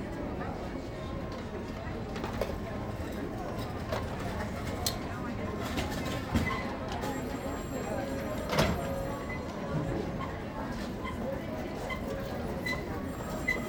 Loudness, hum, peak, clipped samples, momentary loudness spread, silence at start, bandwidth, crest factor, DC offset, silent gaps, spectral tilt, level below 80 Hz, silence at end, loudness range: -35 LUFS; none; -12 dBFS; under 0.1%; 6 LU; 0 s; over 20 kHz; 24 dB; under 0.1%; none; -5.5 dB/octave; -44 dBFS; 0 s; 4 LU